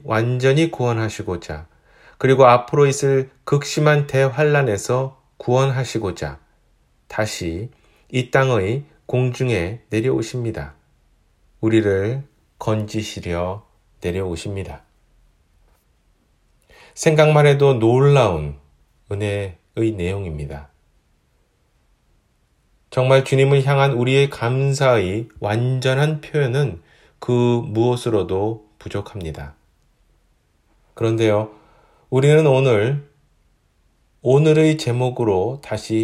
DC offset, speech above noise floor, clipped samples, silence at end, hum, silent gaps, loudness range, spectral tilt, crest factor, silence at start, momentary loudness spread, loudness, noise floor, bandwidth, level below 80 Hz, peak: under 0.1%; 44 dB; under 0.1%; 0 s; none; none; 10 LU; -6.5 dB/octave; 20 dB; 0.05 s; 16 LU; -19 LUFS; -62 dBFS; 13 kHz; -48 dBFS; 0 dBFS